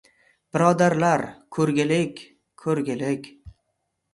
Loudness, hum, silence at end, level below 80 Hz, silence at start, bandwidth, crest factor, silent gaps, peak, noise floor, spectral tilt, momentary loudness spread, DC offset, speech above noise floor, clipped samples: -23 LUFS; none; 0.65 s; -60 dBFS; 0.55 s; 11.5 kHz; 20 dB; none; -4 dBFS; -76 dBFS; -6 dB/octave; 13 LU; under 0.1%; 54 dB; under 0.1%